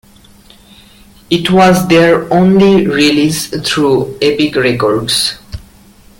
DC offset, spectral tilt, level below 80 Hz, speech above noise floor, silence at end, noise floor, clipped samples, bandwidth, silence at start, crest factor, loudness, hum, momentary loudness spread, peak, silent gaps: under 0.1%; -5 dB/octave; -40 dBFS; 31 dB; 0.65 s; -41 dBFS; under 0.1%; 17 kHz; 1.3 s; 12 dB; -10 LUFS; none; 8 LU; 0 dBFS; none